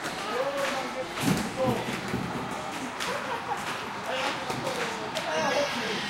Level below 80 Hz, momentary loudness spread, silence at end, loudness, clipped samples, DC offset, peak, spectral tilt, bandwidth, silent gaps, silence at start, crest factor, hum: -56 dBFS; 6 LU; 0 s; -30 LUFS; under 0.1%; under 0.1%; -12 dBFS; -4 dB/octave; 16 kHz; none; 0 s; 18 dB; none